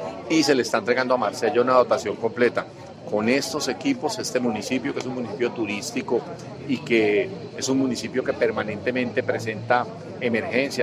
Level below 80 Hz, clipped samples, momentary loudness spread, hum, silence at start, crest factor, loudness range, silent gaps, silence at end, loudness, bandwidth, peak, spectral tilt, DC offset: -60 dBFS; under 0.1%; 9 LU; none; 0 s; 20 dB; 4 LU; none; 0 s; -24 LUFS; 16 kHz; -4 dBFS; -4.5 dB/octave; under 0.1%